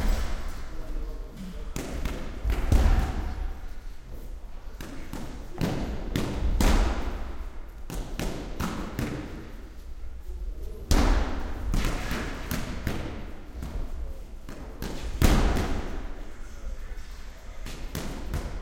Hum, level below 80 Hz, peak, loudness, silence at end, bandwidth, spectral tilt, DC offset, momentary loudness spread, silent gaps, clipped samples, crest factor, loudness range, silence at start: none; -30 dBFS; -4 dBFS; -32 LUFS; 0 s; 17 kHz; -5.5 dB/octave; under 0.1%; 19 LU; none; under 0.1%; 24 dB; 5 LU; 0 s